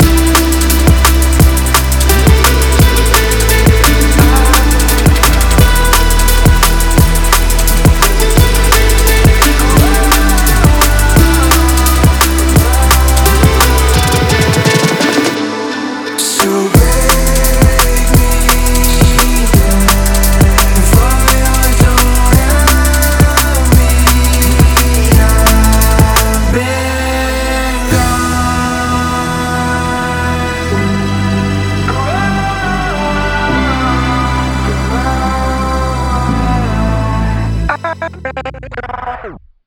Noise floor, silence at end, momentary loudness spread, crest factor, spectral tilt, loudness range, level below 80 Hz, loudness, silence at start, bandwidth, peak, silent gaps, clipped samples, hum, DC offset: -30 dBFS; 0.3 s; 6 LU; 8 dB; -4.5 dB/octave; 5 LU; -12 dBFS; -10 LUFS; 0 s; over 20 kHz; 0 dBFS; none; 0.2%; none; under 0.1%